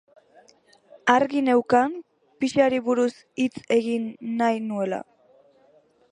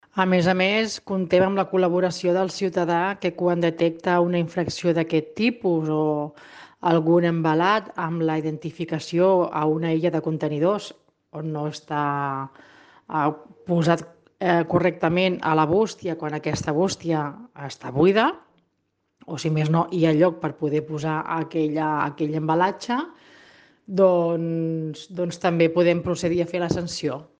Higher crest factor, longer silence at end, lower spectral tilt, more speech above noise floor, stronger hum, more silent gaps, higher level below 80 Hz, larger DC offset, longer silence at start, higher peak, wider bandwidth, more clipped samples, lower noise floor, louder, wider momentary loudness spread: about the same, 22 dB vs 18 dB; first, 1.1 s vs 0.15 s; second, -5 dB/octave vs -6.5 dB/octave; second, 37 dB vs 51 dB; neither; neither; second, -68 dBFS vs -58 dBFS; neither; first, 1.05 s vs 0.15 s; about the same, -2 dBFS vs -4 dBFS; first, 10.5 kHz vs 9.4 kHz; neither; second, -59 dBFS vs -73 dBFS; about the same, -23 LUFS vs -23 LUFS; about the same, 9 LU vs 10 LU